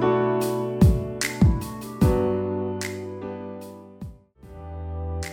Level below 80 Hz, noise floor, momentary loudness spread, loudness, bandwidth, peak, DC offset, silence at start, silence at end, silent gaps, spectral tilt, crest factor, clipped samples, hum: -32 dBFS; -45 dBFS; 20 LU; -24 LUFS; 17.5 kHz; -6 dBFS; under 0.1%; 0 s; 0 s; none; -6.5 dB/octave; 20 dB; under 0.1%; none